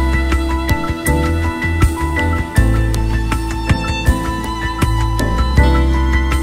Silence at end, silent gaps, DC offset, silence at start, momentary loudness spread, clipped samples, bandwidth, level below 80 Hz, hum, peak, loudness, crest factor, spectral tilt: 0 s; none; under 0.1%; 0 s; 5 LU; under 0.1%; 16 kHz; -18 dBFS; none; 0 dBFS; -16 LUFS; 14 dB; -6 dB/octave